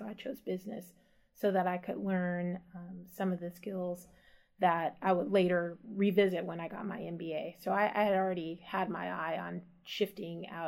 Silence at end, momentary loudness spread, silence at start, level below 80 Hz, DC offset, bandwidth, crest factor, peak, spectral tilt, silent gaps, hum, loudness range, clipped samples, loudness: 0 s; 14 LU; 0 s; -74 dBFS; under 0.1%; 16 kHz; 20 dB; -16 dBFS; -7 dB/octave; none; none; 4 LU; under 0.1%; -34 LUFS